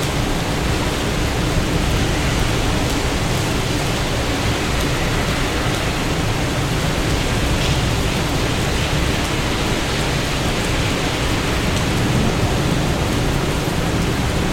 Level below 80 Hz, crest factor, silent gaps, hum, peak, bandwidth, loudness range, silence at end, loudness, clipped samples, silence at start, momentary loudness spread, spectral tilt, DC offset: -26 dBFS; 14 dB; none; none; -4 dBFS; 16.5 kHz; 1 LU; 0 s; -19 LUFS; under 0.1%; 0 s; 2 LU; -4.5 dB/octave; under 0.1%